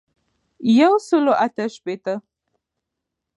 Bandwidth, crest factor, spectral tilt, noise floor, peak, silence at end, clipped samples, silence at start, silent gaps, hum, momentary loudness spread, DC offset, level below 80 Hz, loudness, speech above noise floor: 11 kHz; 18 dB; -5.5 dB/octave; -81 dBFS; -2 dBFS; 1.2 s; under 0.1%; 0.6 s; none; none; 13 LU; under 0.1%; -76 dBFS; -19 LUFS; 64 dB